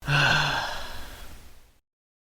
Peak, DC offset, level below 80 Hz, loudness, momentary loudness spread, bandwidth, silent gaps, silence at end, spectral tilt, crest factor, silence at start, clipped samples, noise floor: -10 dBFS; under 0.1%; -44 dBFS; -24 LUFS; 23 LU; 19 kHz; none; 0.7 s; -3.5 dB/octave; 20 dB; 0 s; under 0.1%; -47 dBFS